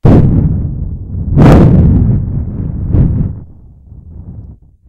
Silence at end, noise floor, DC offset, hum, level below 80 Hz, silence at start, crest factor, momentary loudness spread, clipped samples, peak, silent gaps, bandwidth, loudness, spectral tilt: 0.35 s; -35 dBFS; under 0.1%; none; -18 dBFS; 0.05 s; 10 dB; 24 LU; 2%; 0 dBFS; none; 7.8 kHz; -10 LUFS; -10 dB/octave